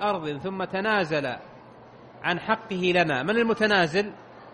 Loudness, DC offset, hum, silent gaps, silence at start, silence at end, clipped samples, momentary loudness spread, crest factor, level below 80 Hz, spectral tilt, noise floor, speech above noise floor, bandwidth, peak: -25 LUFS; under 0.1%; none; none; 0 s; 0 s; under 0.1%; 11 LU; 18 dB; -62 dBFS; -5.5 dB/octave; -48 dBFS; 23 dB; 10.5 kHz; -8 dBFS